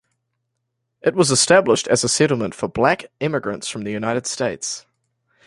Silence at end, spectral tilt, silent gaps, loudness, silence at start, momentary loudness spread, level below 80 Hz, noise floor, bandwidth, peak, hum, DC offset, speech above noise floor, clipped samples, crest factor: 0.65 s; -3.5 dB/octave; none; -19 LUFS; 1.05 s; 12 LU; -56 dBFS; -76 dBFS; 11.5 kHz; -2 dBFS; none; under 0.1%; 57 dB; under 0.1%; 18 dB